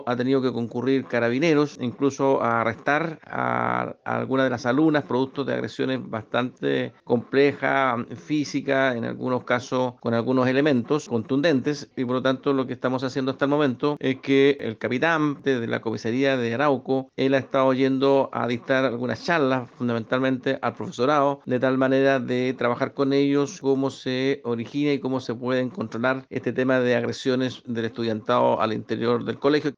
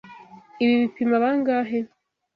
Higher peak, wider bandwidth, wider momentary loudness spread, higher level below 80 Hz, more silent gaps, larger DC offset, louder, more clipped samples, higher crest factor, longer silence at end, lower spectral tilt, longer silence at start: first, -6 dBFS vs -10 dBFS; first, 7.6 kHz vs 5.2 kHz; about the same, 7 LU vs 8 LU; about the same, -68 dBFS vs -68 dBFS; neither; neither; about the same, -24 LUFS vs -22 LUFS; neither; about the same, 18 dB vs 14 dB; second, 0.05 s vs 0.5 s; about the same, -6.5 dB/octave vs -7.5 dB/octave; about the same, 0 s vs 0.05 s